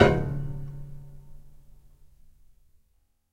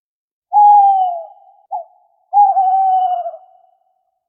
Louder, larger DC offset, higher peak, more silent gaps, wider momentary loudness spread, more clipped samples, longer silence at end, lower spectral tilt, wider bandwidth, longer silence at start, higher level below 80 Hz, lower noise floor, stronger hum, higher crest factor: second, -29 LUFS vs -12 LUFS; neither; about the same, -2 dBFS vs -2 dBFS; neither; first, 25 LU vs 20 LU; neither; first, 1.8 s vs 0.95 s; first, -7.5 dB/octave vs 10.5 dB/octave; first, 9.8 kHz vs 3.4 kHz; second, 0 s vs 0.5 s; first, -42 dBFS vs under -90 dBFS; about the same, -68 dBFS vs -65 dBFS; neither; first, 28 dB vs 12 dB